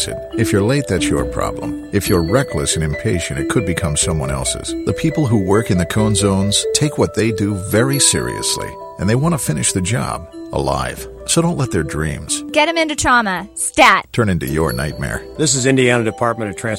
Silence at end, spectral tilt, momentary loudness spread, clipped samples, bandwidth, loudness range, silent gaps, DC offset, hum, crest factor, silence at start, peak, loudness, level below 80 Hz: 0 s; -4 dB/octave; 9 LU; under 0.1%; 16 kHz; 3 LU; none; under 0.1%; none; 16 dB; 0 s; 0 dBFS; -16 LUFS; -34 dBFS